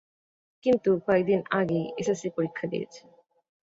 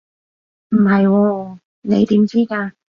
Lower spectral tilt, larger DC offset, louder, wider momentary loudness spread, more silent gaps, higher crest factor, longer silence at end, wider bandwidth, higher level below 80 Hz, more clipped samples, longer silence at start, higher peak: second, -6.5 dB/octave vs -9 dB/octave; neither; second, -27 LUFS vs -16 LUFS; second, 9 LU vs 13 LU; second, none vs 1.65-1.82 s; about the same, 18 dB vs 14 dB; first, 0.8 s vs 0.25 s; first, 8 kHz vs 6.6 kHz; second, -64 dBFS vs -56 dBFS; neither; about the same, 0.65 s vs 0.7 s; second, -10 dBFS vs -4 dBFS